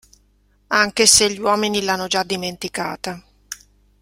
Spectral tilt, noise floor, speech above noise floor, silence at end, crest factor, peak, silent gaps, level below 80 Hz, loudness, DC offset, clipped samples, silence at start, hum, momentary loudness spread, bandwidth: -1.5 dB/octave; -59 dBFS; 40 dB; 0.45 s; 20 dB; 0 dBFS; none; -52 dBFS; -17 LUFS; under 0.1%; under 0.1%; 0.7 s; 50 Hz at -50 dBFS; 24 LU; 16.5 kHz